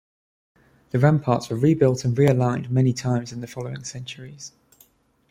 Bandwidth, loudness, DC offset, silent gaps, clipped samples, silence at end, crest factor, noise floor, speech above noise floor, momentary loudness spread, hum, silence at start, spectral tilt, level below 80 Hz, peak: 12 kHz; -22 LUFS; under 0.1%; none; under 0.1%; 0.85 s; 18 dB; -58 dBFS; 37 dB; 18 LU; none; 0.95 s; -7 dB/octave; -56 dBFS; -4 dBFS